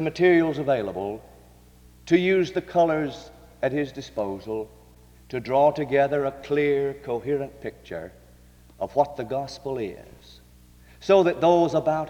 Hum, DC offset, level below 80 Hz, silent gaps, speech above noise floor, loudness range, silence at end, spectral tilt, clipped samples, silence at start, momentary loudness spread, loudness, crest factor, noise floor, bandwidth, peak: 60 Hz at -60 dBFS; under 0.1%; -54 dBFS; none; 28 dB; 6 LU; 0 s; -6.5 dB/octave; under 0.1%; 0 s; 16 LU; -24 LUFS; 20 dB; -52 dBFS; 16 kHz; -6 dBFS